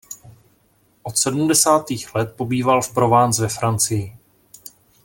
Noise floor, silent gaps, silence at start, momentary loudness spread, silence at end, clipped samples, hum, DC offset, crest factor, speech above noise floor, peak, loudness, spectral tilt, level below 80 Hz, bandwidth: -60 dBFS; none; 0.1 s; 16 LU; 0.9 s; under 0.1%; none; under 0.1%; 18 dB; 41 dB; -2 dBFS; -18 LUFS; -4 dB/octave; -54 dBFS; 17 kHz